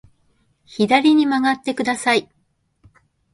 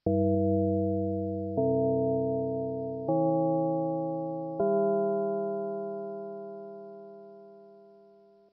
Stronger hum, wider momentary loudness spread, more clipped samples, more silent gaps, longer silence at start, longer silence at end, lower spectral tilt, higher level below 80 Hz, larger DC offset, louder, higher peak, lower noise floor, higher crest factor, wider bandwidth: neither; second, 8 LU vs 17 LU; neither; neither; first, 0.7 s vs 0.05 s; first, 1.1 s vs 0.7 s; second, -4 dB/octave vs -13 dB/octave; first, -62 dBFS vs -68 dBFS; neither; first, -18 LUFS vs -29 LUFS; first, 0 dBFS vs -18 dBFS; first, -66 dBFS vs -58 dBFS; first, 20 dB vs 12 dB; first, 11.5 kHz vs 1.5 kHz